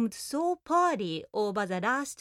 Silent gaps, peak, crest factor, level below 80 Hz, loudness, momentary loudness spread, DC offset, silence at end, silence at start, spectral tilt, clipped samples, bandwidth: none; -14 dBFS; 14 dB; -70 dBFS; -29 LUFS; 6 LU; under 0.1%; 0.05 s; 0 s; -4.5 dB/octave; under 0.1%; 16 kHz